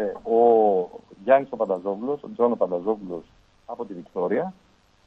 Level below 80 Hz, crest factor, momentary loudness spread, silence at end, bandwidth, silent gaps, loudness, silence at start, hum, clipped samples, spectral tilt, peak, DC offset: -64 dBFS; 18 dB; 17 LU; 0.55 s; 4.3 kHz; none; -23 LUFS; 0 s; none; under 0.1%; -8.5 dB/octave; -4 dBFS; under 0.1%